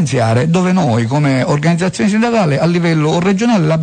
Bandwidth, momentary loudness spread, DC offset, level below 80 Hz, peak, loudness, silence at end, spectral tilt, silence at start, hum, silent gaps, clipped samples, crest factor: 9.4 kHz; 1 LU; under 0.1%; -46 dBFS; -4 dBFS; -13 LUFS; 0 s; -6.5 dB/octave; 0 s; none; none; under 0.1%; 8 dB